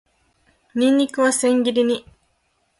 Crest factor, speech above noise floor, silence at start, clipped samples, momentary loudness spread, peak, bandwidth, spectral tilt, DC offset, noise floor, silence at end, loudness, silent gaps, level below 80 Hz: 14 dB; 49 dB; 0.75 s; under 0.1%; 7 LU; -6 dBFS; 11.5 kHz; -2.5 dB/octave; under 0.1%; -67 dBFS; 0.8 s; -19 LUFS; none; -62 dBFS